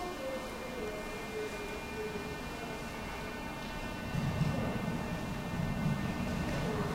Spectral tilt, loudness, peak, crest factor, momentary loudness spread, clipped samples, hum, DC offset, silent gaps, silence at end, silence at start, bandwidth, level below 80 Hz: -6 dB/octave; -37 LUFS; -20 dBFS; 16 dB; 7 LU; under 0.1%; none; under 0.1%; none; 0 s; 0 s; 16 kHz; -48 dBFS